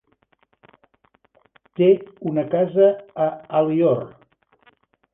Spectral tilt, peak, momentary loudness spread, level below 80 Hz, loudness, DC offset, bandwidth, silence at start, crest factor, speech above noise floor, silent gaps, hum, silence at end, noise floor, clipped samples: -11 dB/octave; -4 dBFS; 9 LU; -66 dBFS; -20 LUFS; under 0.1%; 3.8 kHz; 1.8 s; 18 dB; 45 dB; none; none; 1.05 s; -64 dBFS; under 0.1%